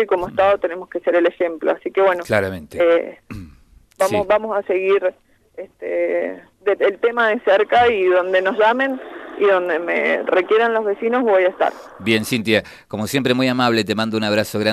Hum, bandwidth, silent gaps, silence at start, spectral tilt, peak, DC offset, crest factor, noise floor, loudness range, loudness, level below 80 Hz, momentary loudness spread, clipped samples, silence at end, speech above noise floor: none; 13.5 kHz; none; 0 s; -5 dB/octave; -2 dBFS; under 0.1%; 18 dB; -49 dBFS; 4 LU; -18 LUFS; -54 dBFS; 10 LU; under 0.1%; 0 s; 31 dB